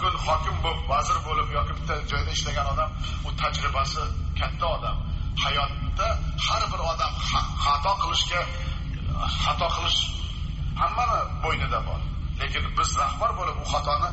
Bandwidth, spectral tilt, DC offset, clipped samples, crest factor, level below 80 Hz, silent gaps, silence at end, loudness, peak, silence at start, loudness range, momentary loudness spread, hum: 8 kHz; -2.5 dB/octave; under 0.1%; under 0.1%; 14 dB; -30 dBFS; none; 0 s; -26 LUFS; -12 dBFS; 0 s; 2 LU; 7 LU; none